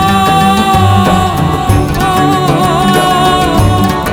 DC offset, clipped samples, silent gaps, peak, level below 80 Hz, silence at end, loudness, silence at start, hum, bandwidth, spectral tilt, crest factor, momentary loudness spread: under 0.1%; under 0.1%; none; 0 dBFS; -24 dBFS; 0 s; -9 LUFS; 0 s; none; 18.5 kHz; -5.5 dB/octave; 8 dB; 3 LU